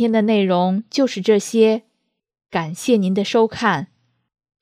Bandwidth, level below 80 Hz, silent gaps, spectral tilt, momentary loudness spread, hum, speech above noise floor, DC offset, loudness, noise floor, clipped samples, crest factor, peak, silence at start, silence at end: 15 kHz; -64 dBFS; none; -5.5 dB/octave; 9 LU; none; 55 dB; under 0.1%; -18 LUFS; -72 dBFS; under 0.1%; 16 dB; -4 dBFS; 0 s; 0.75 s